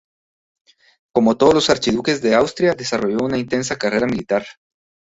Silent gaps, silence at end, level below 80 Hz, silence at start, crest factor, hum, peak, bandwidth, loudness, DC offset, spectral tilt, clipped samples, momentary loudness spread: none; 0.6 s; -50 dBFS; 1.15 s; 18 dB; none; -2 dBFS; 8 kHz; -18 LUFS; under 0.1%; -4.5 dB/octave; under 0.1%; 8 LU